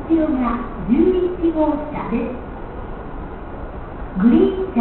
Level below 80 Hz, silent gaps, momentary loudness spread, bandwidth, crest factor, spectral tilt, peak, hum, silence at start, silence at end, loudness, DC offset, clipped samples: -34 dBFS; none; 17 LU; 4.2 kHz; 16 dB; -12.5 dB/octave; -4 dBFS; none; 0 s; 0 s; -19 LUFS; under 0.1%; under 0.1%